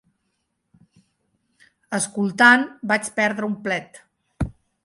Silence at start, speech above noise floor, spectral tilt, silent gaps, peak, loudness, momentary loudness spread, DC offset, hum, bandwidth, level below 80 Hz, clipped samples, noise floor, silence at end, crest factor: 1.9 s; 54 dB; -4 dB/octave; none; -2 dBFS; -20 LUFS; 17 LU; under 0.1%; none; 11.5 kHz; -46 dBFS; under 0.1%; -74 dBFS; 0.35 s; 22 dB